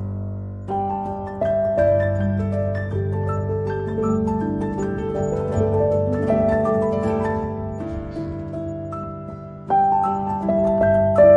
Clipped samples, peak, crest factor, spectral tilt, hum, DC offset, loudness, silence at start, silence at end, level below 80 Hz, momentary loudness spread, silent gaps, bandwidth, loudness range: under 0.1%; -4 dBFS; 18 dB; -9.5 dB/octave; none; under 0.1%; -22 LUFS; 0 s; 0 s; -42 dBFS; 11 LU; none; 7.8 kHz; 3 LU